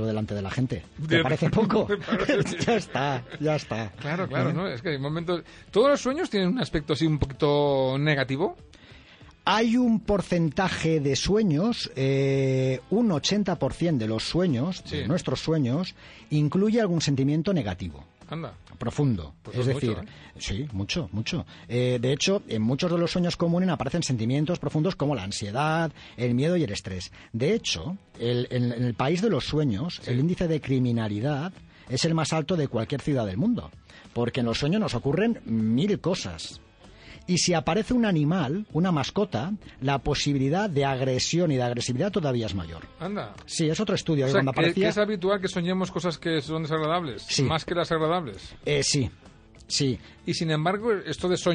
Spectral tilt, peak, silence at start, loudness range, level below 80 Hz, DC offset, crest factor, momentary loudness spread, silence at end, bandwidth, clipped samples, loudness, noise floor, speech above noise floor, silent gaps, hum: -5.5 dB/octave; -8 dBFS; 0 s; 3 LU; -50 dBFS; under 0.1%; 18 dB; 9 LU; 0 s; 10 kHz; under 0.1%; -26 LUFS; -51 dBFS; 25 dB; none; none